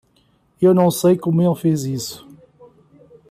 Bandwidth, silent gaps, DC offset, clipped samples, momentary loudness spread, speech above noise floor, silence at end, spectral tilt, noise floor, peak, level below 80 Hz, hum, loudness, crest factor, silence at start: 15 kHz; none; under 0.1%; under 0.1%; 13 LU; 43 dB; 1.15 s; -7 dB/octave; -59 dBFS; -4 dBFS; -60 dBFS; none; -17 LUFS; 16 dB; 0.6 s